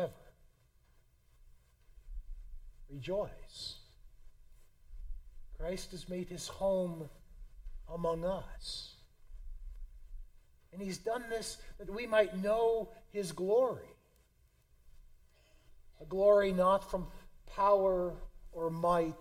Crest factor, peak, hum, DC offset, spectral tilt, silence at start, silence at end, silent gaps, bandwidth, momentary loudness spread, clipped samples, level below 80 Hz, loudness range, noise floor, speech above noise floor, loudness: 22 dB; -16 dBFS; none; under 0.1%; -5.5 dB/octave; 0 s; 0 s; none; 16 kHz; 25 LU; under 0.1%; -52 dBFS; 14 LU; -69 dBFS; 35 dB; -34 LUFS